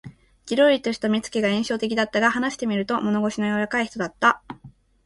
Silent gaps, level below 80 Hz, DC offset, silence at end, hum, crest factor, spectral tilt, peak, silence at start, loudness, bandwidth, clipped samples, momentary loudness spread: none; -58 dBFS; under 0.1%; 0.35 s; none; 18 dB; -4.5 dB/octave; -4 dBFS; 0.05 s; -22 LUFS; 11.5 kHz; under 0.1%; 8 LU